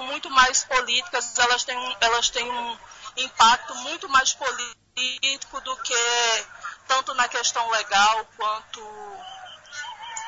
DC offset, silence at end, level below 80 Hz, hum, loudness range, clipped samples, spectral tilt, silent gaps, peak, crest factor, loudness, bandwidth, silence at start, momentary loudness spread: under 0.1%; 0 s; -56 dBFS; none; 2 LU; under 0.1%; 1.5 dB/octave; none; -4 dBFS; 20 dB; -22 LUFS; 8 kHz; 0 s; 19 LU